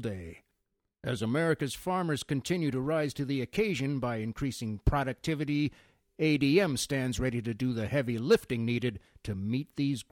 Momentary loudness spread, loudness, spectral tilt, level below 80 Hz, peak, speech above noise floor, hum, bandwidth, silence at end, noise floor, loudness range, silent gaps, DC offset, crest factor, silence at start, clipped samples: 8 LU; -31 LUFS; -6 dB/octave; -46 dBFS; -12 dBFS; 51 dB; none; 17.5 kHz; 0.1 s; -81 dBFS; 3 LU; none; under 0.1%; 20 dB; 0 s; under 0.1%